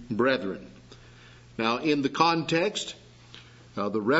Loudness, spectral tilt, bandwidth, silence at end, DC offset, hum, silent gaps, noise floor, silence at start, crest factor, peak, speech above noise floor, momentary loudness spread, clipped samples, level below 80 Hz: -27 LUFS; -4.5 dB/octave; 8 kHz; 0 s; under 0.1%; none; none; -51 dBFS; 0 s; 22 dB; -6 dBFS; 25 dB; 25 LU; under 0.1%; -62 dBFS